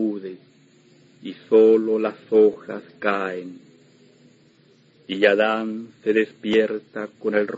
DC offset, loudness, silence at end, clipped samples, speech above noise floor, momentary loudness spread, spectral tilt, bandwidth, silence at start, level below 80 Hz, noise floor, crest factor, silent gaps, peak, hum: under 0.1%; -21 LUFS; 0 s; under 0.1%; 35 dB; 19 LU; -6.5 dB/octave; 7.6 kHz; 0 s; -72 dBFS; -56 dBFS; 20 dB; none; -2 dBFS; none